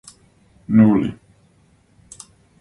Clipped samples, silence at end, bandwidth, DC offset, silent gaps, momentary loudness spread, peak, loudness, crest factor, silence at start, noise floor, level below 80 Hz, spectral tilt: under 0.1%; 1.5 s; 11 kHz; under 0.1%; none; 27 LU; -2 dBFS; -16 LUFS; 20 dB; 0.7 s; -56 dBFS; -52 dBFS; -8 dB/octave